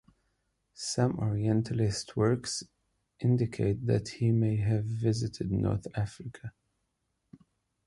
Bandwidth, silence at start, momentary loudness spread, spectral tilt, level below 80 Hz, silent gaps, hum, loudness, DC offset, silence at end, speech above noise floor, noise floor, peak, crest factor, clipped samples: 11.5 kHz; 0.8 s; 9 LU; -6.5 dB/octave; -54 dBFS; none; none; -30 LUFS; under 0.1%; 1.35 s; 51 dB; -80 dBFS; -14 dBFS; 18 dB; under 0.1%